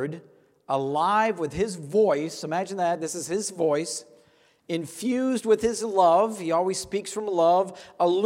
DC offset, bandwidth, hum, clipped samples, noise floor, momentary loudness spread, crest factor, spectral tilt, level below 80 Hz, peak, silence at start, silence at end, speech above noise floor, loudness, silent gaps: under 0.1%; 16 kHz; none; under 0.1%; -60 dBFS; 10 LU; 18 dB; -4.5 dB/octave; -58 dBFS; -8 dBFS; 0 s; 0 s; 36 dB; -25 LUFS; none